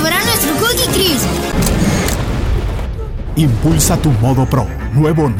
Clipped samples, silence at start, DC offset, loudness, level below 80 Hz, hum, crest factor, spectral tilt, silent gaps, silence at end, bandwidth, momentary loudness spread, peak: under 0.1%; 0 s; under 0.1%; -14 LUFS; -22 dBFS; none; 12 dB; -4.5 dB/octave; none; 0 s; 18 kHz; 7 LU; 0 dBFS